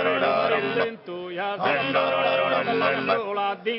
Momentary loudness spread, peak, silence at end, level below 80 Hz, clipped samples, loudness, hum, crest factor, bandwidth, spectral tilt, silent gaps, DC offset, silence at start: 8 LU; -8 dBFS; 0 s; -74 dBFS; under 0.1%; -23 LUFS; none; 14 dB; 5.8 kHz; -8 dB/octave; none; under 0.1%; 0 s